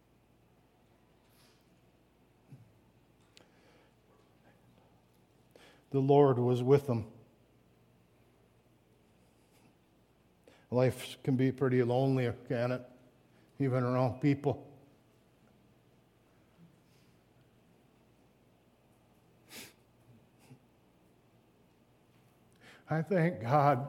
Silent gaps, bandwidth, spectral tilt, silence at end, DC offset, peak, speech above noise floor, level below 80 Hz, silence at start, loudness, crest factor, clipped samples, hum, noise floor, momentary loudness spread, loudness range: none; 15.5 kHz; -8 dB/octave; 0 s; under 0.1%; -14 dBFS; 38 dB; -74 dBFS; 2.5 s; -31 LUFS; 22 dB; under 0.1%; none; -67 dBFS; 18 LU; 8 LU